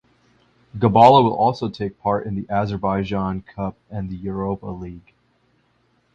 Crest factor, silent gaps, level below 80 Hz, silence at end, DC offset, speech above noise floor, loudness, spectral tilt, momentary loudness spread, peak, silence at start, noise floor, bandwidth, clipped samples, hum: 20 dB; none; -46 dBFS; 1.15 s; under 0.1%; 44 dB; -20 LUFS; -8 dB/octave; 19 LU; 0 dBFS; 0.75 s; -63 dBFS; 8.6 kHz; under 0.1%; 60 Hz at -50 dBFS